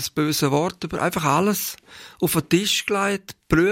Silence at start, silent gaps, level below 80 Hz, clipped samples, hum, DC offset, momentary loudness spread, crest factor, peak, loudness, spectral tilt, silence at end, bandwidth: 0 s; none; -46 dBFS; under 0.1%; none; under 0.1%; 7 LU; 18 dB; -4 dBFS; -22 LUFS; -4 dB/octave; 0 s; 16.5 kHz